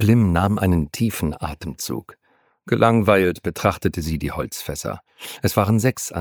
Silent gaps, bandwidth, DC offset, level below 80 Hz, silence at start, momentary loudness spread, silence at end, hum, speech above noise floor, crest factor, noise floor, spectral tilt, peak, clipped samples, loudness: none; over 20 kHz; under 0.1%; -38 dBFS; 0 s; 13 LU; 0 s; none; 32 dB; 20 dB; -52 dBFS; -6 dB/octave; 0 dBFS; under 0.1%; -21 LUFS